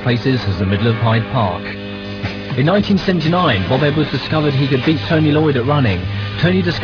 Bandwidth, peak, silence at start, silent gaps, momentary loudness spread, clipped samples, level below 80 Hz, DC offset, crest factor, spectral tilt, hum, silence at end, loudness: 5.4 kHz; -2 dBFS; 0 s; none; 9 LU; under 0.1%; -40 dBFS; under 0.1%; 14 dB; -8 dB/octave; none; 0 s; -16 LUFS